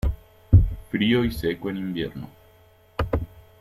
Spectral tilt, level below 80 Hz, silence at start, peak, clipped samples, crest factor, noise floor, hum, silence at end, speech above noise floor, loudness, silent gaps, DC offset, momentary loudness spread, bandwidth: -7.5 dB/octave; -32 dBFS; 0.05 s; -2 dBFS; under 0.1%; 22 dB; -55 dBFS; none; 0.2 s; 30 dB; -24 LUFS; none; under 0.1%; 21 LU; 14 kHz